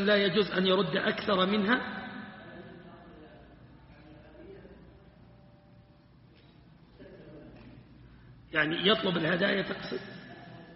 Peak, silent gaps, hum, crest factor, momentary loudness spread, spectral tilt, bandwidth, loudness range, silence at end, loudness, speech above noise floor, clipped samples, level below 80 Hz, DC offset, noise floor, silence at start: -10 dBFS; none; none; 22 dB; 25 LU; -3 dB/octave; 5.8 kHz; 24 LU; 0 s; -28 LUFS; 30 dB; under 0.1%; -62 dBFS; under 0.1%; -58 dBFS; 0 s